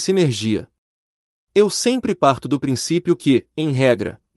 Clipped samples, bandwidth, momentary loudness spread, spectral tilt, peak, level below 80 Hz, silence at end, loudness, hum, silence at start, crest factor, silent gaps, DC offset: under 0.1%; 12 kHz; 5 LU; -5.5 dB/octave; -2 dBFS; -56 dBFS; 0.2 s; -19 LUFS; none; 0 s; 18 dB; 0.78-1.47 s; under 0.1%